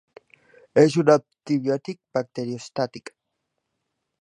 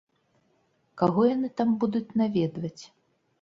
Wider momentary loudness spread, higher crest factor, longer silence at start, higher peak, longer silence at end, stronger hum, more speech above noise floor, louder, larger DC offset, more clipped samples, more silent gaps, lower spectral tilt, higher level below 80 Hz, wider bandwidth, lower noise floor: about the same, 13 LU vs 13 LU; about the same, 22 dB vs 20 dB; second, 0.75 s vs 0.95 s; first, -2 dBFS vs -8 dBFS; first, 1.2 s vs 0.55 s; neither; first, 57 dB vs 44 dB; first, -23 LUFS vs -26 LUFS; neither; neither; neither; second, -6.5 dB/octave vs -8 dB/octave; second, -72 dBFS vs -66 dBFS; first, 11 kHz vs 7.6 kHz; first, -79 dBFS vs -69 dBFS